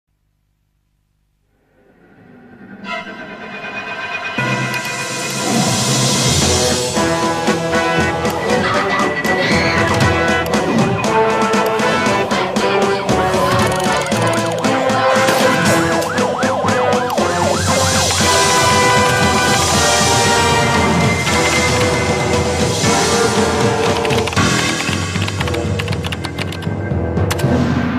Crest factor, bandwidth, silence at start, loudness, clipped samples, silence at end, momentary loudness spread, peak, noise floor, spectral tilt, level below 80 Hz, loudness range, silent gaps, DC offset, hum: 14 dB; 15.5 kHz; 2.55 s; -15 LUFS; under 0.1%; 0 s; 8 LU; -2 dBFS; -63 dBFS; -3.5 dB/octave; -36 dBFS; 9 LU; none; under 0.1%; none